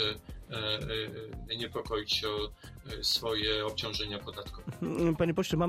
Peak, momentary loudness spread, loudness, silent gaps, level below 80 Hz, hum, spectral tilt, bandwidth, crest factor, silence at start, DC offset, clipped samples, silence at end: -16 dBFS; 14 LU; -33 LUFS; none; -50 dBFS; none; -4.5 dB/octave; 16 kHz; 18 dB; 0 s; under 0.1%; under 0.1%; 0 s